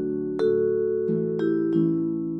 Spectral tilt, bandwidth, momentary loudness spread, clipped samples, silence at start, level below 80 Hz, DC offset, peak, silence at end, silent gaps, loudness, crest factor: -10 dB/octave; 5.4 kHz; 3 LU; under 0.1%; 0 s; -72 dBFS; under 0.1%; -12 dBFS; 0 s; none; -24 LUFS; 12 dB